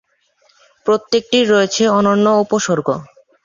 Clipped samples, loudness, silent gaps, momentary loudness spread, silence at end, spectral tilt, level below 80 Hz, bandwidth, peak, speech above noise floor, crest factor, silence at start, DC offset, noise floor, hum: under 0.1%; -15 LUFS; none; 8 LU; 0.4 s; -4.5 dB/octave; -58 dBFS; 7.6 kHz; -2 dBFS; 44 dB; 14 dB; 0.85 s; under 0.1%; -58 dBFS; none